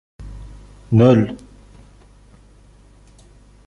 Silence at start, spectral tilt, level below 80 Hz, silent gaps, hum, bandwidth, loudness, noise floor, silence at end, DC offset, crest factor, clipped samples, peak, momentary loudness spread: 0.2 s; -9 dB/octave; -42 dBFS; none; 50 Hz at -45 dBFS; 7 kHz; -15 LUFS; -48 dBFS; 2.3 s; under 0.1%; 20 dB; under 0.1%; -2 dBFS; 27 LU